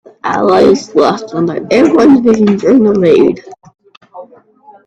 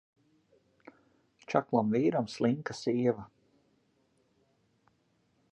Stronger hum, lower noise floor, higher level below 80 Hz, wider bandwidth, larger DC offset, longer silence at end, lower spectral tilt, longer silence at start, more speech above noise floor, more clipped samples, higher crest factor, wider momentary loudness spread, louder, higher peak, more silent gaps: neither; second, -42 dBFS vs -73 dBFS; first, -48 dBFS vs -74 dBFS; second, 8.6 kHz vs 9.8 kHz; neither; second, 0.6 s vs 2.25 s; about the same, -6.5 dB/octave vs -7 dB/octave; second, 0.25 s vs 1.5 s; second, 33 dB vs 43 dB; neither; second, 10 dB vs 24 dB; first, 9 LU vs 5 LU; first, -9 LUFS vs -31 LUFS; first, 0 dBFS vs -10 dBFS; first, 3.97-4.01 s vs none